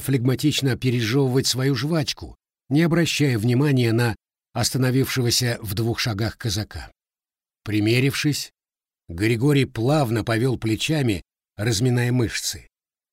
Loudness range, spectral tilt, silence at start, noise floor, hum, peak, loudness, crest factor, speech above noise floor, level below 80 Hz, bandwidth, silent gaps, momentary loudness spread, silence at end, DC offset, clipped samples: 3 LU; -5 dB/octave; 0 s; under -90 dBFS; none; -8 dBFS; -22 LUFS; 14 dB; over 69 dB; -48 dBFS; 16 kHz; none; 9 LU; 0.5 s; under 0.1%; under 0.1%